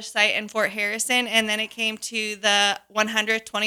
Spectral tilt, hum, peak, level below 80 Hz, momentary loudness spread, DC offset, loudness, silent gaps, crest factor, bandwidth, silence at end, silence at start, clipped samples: -1 dB/octave; none; -4 dBFS; -70 dBFS; 6 LU; under 0.1%; -22 LUFS; none; 20 dB; 19 kHz; 0 s; 0 s; under 0.1%